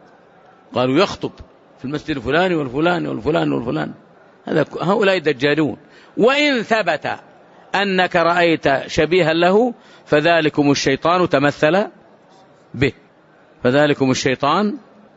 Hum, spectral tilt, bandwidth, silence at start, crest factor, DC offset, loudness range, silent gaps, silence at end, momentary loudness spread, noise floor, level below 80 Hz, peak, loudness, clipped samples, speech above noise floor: none; -3.5 dB/octave; 8 kHz; 0.7 s; 16 dB; under 0.1%; 4 LU; none; 0.4 s; 13 LU; -50 dBFS; -50 dBFS; -2 dBFS; -17 LUFS; under 0.1%; 33 dB